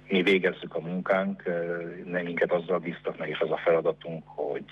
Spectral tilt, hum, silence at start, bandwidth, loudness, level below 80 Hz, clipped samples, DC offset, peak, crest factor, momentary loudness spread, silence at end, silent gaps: -7 dB/octave; 50 Hz at -55 dBFS; 0.05 s; 8.8 kHz; -28 LUFS; -66 dBFS; under 0.1%; under 0.1%; -12 dBFS; 16 dB; 11 LU; 0 s; none